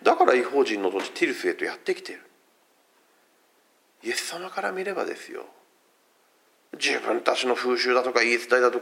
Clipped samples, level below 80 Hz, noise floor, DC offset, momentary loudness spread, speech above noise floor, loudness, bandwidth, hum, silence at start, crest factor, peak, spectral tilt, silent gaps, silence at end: under 0.1%; -86 dBFS; -64 dBFS; under 0.1%; 17 LU; 39 dB; -24 LUFS; 16.5 kHz; none; 0 s; 24 dB; -2 dBFS; -2 dB/octave; none; 0 s